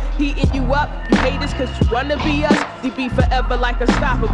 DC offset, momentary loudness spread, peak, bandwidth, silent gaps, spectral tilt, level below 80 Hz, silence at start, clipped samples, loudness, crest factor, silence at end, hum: under 0.1%; 5 LU; -2 dBFS; 10 kHz; none; -6 dB/octave; -22 dBFS; 0 s; under 0.1%; -18 LUFS; 16 dB; 0 s; none